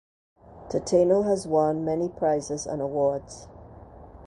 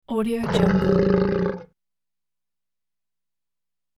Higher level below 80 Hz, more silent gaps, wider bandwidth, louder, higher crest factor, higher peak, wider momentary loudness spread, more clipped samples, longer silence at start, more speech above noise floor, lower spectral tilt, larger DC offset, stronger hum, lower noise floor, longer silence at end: second, -54 dBFS vs -44 dBFS; neither; second, 11 kHz vs 12.5 kHz; second, -25 LUFS vs -21 LUFS; about the same, 18 dB vs 20 dB; second, -8 dBFS vs -4 dBFS; first, 11 LU vs 8 LU; neither; first, 0.5 s vs 0.1 s; second, 22 dB vs over 70 dB; second, -6 dB/octave vs -8 dB/octave; neither; second, none vs 60 Hz at -50 dBFS; second, -46 dBFS vs under -90 dBFS; second, 0 s vs 2.35 s